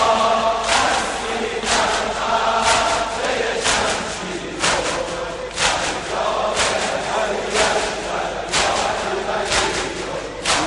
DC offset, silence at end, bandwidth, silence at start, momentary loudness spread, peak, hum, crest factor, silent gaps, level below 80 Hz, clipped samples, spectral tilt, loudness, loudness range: under 0.1%; 0 s; 11.5 kHz; 0 s; 7 LU; -2 dBFS; none; 18 dB; none; -40 dBFS; under 0.1%; -1.5 dB/octave; -19 LUFS; 2 LU